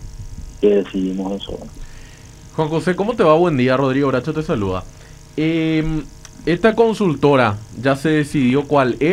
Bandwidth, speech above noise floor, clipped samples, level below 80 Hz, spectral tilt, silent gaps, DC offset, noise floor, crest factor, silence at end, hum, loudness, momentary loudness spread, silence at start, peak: 14 kHz; 23 dB; under 0.1%; -38 dBFS; -7 dB/octave; none; under 0.1%; -39 dBFS; 18 dB; 0 s; none; -17 LUFS; 16 LU; 0 s; 0 dBFS